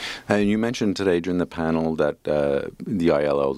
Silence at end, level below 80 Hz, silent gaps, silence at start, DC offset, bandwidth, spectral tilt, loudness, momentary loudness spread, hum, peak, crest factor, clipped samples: 0 s; -48 dBFS; none; 0 s; under 0.1%; 13 kHz; -6.5 dB/octave; -23 LUFS; 4 LU; none; -2 dBFS; 20 dB; under 0.1%